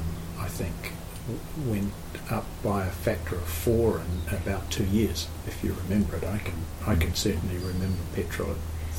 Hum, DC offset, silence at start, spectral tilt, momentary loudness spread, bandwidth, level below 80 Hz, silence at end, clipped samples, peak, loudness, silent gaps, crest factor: none; under 0.1%; 0 s; -5.5 dB/octave; 9 LU; 17 kHz; -38 dBFS; 0 s; under 0.1%; -12 dBFS; -30 LUFS; none; 16 dB